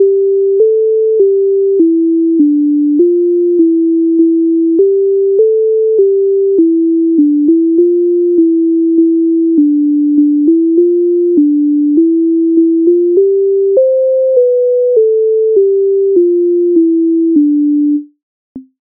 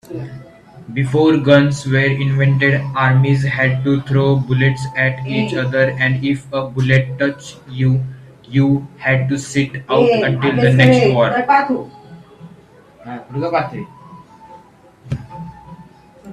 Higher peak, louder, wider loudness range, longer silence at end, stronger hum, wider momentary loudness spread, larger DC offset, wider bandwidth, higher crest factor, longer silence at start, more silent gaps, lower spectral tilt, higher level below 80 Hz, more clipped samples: about the same, 0 dBFS vs 0 dBFS; first, -10 LUFS vs -15 LUFS; second, 0 LU vs 12 LU; first, 0.2 s vs 0 s; neither; second, 1 LU vs 17 LU; neither; second, 0.7 kHz vs 10 kHz; second, 8 dB vs 16 dB; about the same, 0 s vs 0.1 s; first, 18.23-18.55 s vs none; first, -13 dB/octave vs -7 dB/octave; second, -66 dBFS vs -48 dBFS; neither